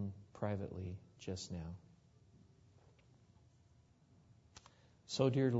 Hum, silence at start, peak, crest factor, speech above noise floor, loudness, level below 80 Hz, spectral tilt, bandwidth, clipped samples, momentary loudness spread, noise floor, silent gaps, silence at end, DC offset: none; 0 s; -18 dBFS; 24 dB; 30 dB; -42 LUFS; -68 dBFS; -6.5 dB/octave; 7.6 kHz; under 0.1%; 26 LU; -69 dBFS; none; 0 s; under 0.1%